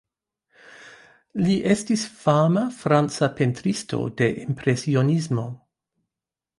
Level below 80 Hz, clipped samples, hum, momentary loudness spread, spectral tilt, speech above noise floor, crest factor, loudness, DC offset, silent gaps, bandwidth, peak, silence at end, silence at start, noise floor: -60 dBFS; under 0.1%; none; 8 LU; -6.5 dB/octave; 67 dB; 18 dB; -22 LUFS; under 0.1%; none; 11.5 kHz; -4 dBFS; 1 s; 0.75 s; -89 dBFS